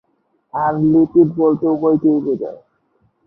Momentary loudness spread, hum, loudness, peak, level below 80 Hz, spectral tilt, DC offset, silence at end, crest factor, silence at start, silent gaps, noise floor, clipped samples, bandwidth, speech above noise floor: 11 LU; none; -16 LUFS; -2 dBFS; -56 dBFS; -12.5 dB/octave; under 0.1%; 0.7 s; 14 dB; 0.55 s; none; -64 dBFS; under 0.1%; 1.8 kHz; 49 dB